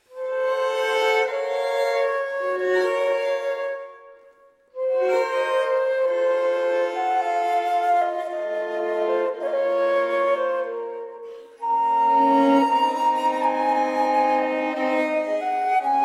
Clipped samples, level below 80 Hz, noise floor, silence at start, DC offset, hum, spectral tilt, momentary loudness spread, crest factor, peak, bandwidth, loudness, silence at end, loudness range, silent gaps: under 0.1%; -78 dBFS; -54 dBFS; 0.1 s; under 0.1%; none; -3 dB/octave; 8 LU; 16 dB; -6 dBFS; 13.5 kHz; -22 LUFS; 0 s; 4 LU; none